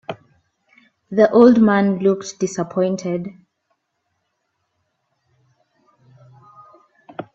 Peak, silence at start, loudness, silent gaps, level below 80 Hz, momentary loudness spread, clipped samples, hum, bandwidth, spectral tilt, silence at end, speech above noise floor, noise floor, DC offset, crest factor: 0 dBFS; 0.1 s; -17 LUFS; none; -62 dBFS; 24 LU; under 0.1%; none; 8 kHz; -6.5 dB/octave; 0.15 s; 57 dB; -73 dBFS; under 0.1%; 20 dB